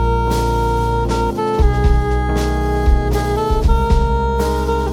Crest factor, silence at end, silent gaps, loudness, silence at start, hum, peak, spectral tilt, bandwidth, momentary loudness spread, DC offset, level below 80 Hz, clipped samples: 14 dB; 0 s; none; -17 LUFS; 0 s; none; -2 dBFS; -7 dB/octave; 14.5 kHz; 3 LU; under 0.1%; -18 dBFS; under 0.1%